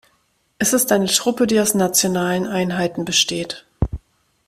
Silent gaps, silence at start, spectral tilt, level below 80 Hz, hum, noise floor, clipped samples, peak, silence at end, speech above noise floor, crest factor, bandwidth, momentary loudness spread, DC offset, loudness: none; 0.6 s; -3 dB/octave; -38 dBFS; none; -64 dBFS; under 0.1%; -2 dBFS; 0.5 s; 45 dB; 18 dB; 16 kHz; 10 LU; under 0.1%; -18 LUFS